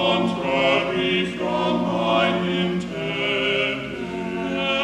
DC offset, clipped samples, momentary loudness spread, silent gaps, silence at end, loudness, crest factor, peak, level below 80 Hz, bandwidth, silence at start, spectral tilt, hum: under 0.1%; under 0.1%; 7 LU; none; 0 s; -22 LUFS; 18 dB; -6 dBFS; -50 dBFS; 11 kHz; 0 s; -5.5 dB/octave; none